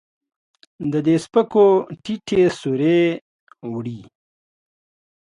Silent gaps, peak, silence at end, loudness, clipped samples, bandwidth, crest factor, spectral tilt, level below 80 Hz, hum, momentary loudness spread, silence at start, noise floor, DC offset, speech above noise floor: 3.21-3.47 s; -4 dBFS; 1.2 s; -19 LUFS; under 0.1%; 11 kHz; 18 dB; -7 dB/octave; -60 dBFS; none; 17 LU; 0.8 s; under -90 dBFS; under 0.1%; over 72 dB